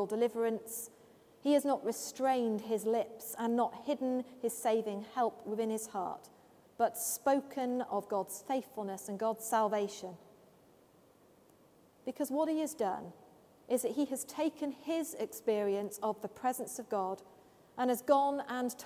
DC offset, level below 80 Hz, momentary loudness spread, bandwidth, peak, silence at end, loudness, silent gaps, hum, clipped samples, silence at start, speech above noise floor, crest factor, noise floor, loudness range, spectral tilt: under 0.1%; -80 dBFS; 9 LU; 16 kHz; -16 dBFS; 0 s; -35 LUFS; none; none; under 0.1%; 0 s; 30 dB; 20 dB; -64 dBFS; 5 LU; -4 dB/octave